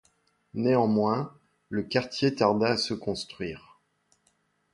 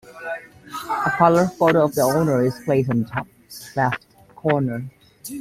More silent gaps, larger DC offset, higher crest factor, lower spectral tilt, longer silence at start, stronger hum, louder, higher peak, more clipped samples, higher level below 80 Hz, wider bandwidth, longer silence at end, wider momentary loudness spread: neither; neither; about the same, 20 dB vs 18 dB; about the same, -6 dB/octave vs -6.5 dB/octave; first, 0.55 s vs 0.05 s; neither; second, -27 LUFS vs -20 LUFS; second, -8 dBFS vs -2 dBFS; neither; second, -62 dBFS vs -54 dBFS; second, 11.5 kHz vs 16 kHz; first, 1.15 s vs 0 s; second, 14 LU vs 18 LU